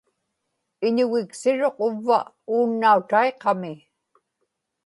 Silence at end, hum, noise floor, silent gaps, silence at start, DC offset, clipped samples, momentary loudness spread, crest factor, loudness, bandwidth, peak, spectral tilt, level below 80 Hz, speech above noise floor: 1.1 s; none; -78 dBFS; none; 0.8 s; under 0.1%; under 0.1%; 9 LU; 18 dB; -22 LUFS; 11.5 kHz; -4 dBFS; -5.5 dB/octave; -78 dBFS; 56 dB